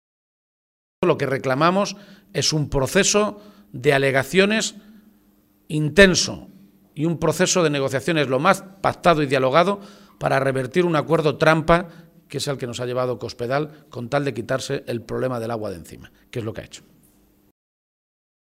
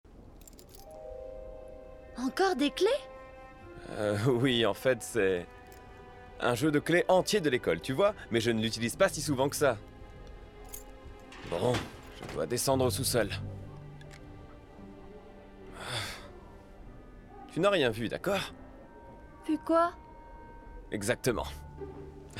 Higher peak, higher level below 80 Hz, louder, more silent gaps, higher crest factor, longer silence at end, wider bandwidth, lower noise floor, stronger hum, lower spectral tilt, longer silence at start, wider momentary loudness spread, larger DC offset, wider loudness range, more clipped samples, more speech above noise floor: first, 0 dBFS vs -12 dBFS; first, -46 dBFS vs -54 dBFS; first, -20 LUFS vs -30 LUFS; neither; about the same, 22 dB vs 20 dB; first, 1.7 s vs 0 s; about the same, 16 kHz vs 16.5 kHz; first, -59 dBFS vs -52 dBFS; neither; about the same, -4.5 dB/octave vs -4.5 dB/octave; first, 1 s vs 0.1 s; second, 14 LU vs 24 LU; neither; about the same, 8 LU vs 7 LU; neither; first, 38 dB vs 22 dB